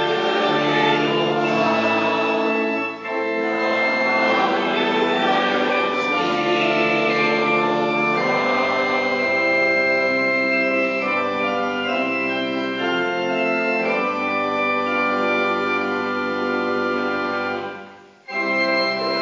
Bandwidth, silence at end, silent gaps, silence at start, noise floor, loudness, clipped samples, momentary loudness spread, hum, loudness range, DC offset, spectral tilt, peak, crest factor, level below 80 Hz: 7.6 kHz; 0 s; none; 0 s; -42 dBFS; -19 LUFS; under 0.1%; 5 LU; none; 3 LU; under 0.1%; -5 dB/octave; -6 dBFS; 14 dB; -64 dBFS